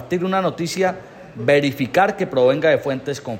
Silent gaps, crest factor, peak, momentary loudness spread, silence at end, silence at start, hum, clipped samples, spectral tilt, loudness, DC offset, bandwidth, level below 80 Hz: none; 16 dB; -4 dBFS; 8 LU; 0 s; 0 s; none; under 0.1%; -5.5 dB/octave; -19 LUFS; under 0.1%; 16 kHz; -58 dBFS